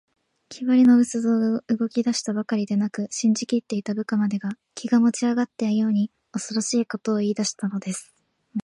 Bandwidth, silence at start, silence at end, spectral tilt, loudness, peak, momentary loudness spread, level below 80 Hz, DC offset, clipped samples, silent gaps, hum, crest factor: 11.5 kHz; 0.5 s; 0.05 s; -5 dB/octave; -23 LUFS; -8 dBFS; 11 LU; -72 dBFS; under 0.1%; under 0.1%; none; none; 14 dB